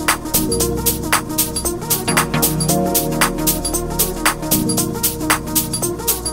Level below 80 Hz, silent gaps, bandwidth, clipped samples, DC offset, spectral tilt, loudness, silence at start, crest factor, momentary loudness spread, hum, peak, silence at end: -32 dBFS; none; 16.5 kHz; under 0.1%; 0.3%; -3 dB/octave; -17 LUFS; 0 s; 18 dB; 3 LU; none; 0 dBFS; 0 s